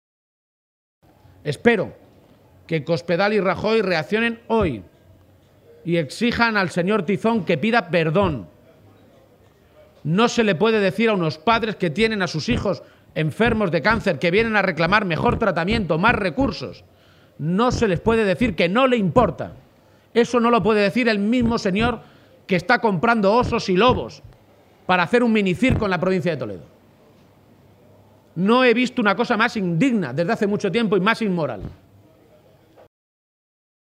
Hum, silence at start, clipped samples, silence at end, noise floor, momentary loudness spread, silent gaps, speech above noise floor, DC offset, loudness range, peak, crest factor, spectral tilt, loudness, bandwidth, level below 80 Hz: none; 1.45 s; under 0.1%; 2.15 s; -54 dBFS; 9 LU; none; 34 dB; under 0.1%; 3 LU; 0 dBFS; 20 dB; -6 dB/octave; -20 LUFS; 12.5 kHz; -44 dBFS